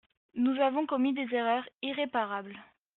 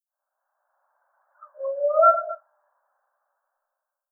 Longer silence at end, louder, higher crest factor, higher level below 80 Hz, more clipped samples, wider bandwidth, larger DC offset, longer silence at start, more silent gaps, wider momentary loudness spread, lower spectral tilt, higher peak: second, 0.35 s vs 1.75 s; second, -31 LUFS vs -20 LUFS; second, 16 dB vs 22 dB; first, -78 dBFS vs under -90 dBFS; neither; first, 4.1 kHz vs 1.8 kHz; neither; second, 0.35 s vs 1.4 s; first, 1.74-1.79 s vs none; second, 13 LU vs 18 LU; first, -2 dB/octave vs 13 dB/octave; second, -14 dBFS vs -6 dBFS